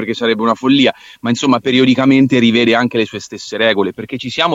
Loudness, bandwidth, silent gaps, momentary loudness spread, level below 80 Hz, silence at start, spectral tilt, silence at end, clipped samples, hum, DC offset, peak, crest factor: -13 LUFS; 7.8 kHz; none; 11 LU; -56 dBFS; 0 s; -5 dB/octave; 0 s; under 0.1%; none; under 0.1%; -2 dBFS; 12 dB